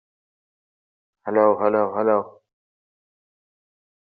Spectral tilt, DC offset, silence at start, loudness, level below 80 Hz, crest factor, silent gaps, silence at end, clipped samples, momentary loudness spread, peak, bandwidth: -7.5 dB/octave; under 0.1%; 1.25 s; -20 LUFS; -74 dBFS; 22 dB; none; 1.85 s; under 0.1%; 14 LU; -4 dBFS; 4.6 kHz